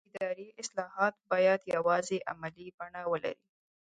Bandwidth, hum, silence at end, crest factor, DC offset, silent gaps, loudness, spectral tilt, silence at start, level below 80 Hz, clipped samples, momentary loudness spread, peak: 9.6 kHz; none; 0.55 s; 20 dB; under 0.1%; 2.74-2.78 s; -32 LUFS; -4 dB/octave; 0.15 s; -76 dBFS; under 0.1%; 15 LU; -14 dBFS